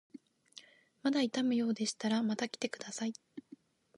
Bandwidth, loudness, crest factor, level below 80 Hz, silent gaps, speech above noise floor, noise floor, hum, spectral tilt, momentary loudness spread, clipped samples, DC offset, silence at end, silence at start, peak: 11.5 kHz; -35 LUFS; 18 dB; -88 dBFS; none; 26 dB; -60 dBFS; none; -4 dB/octave; 23 LU; under 0.1%; under 0.1%; 0.6 s; 0.15 s; -20 dBFS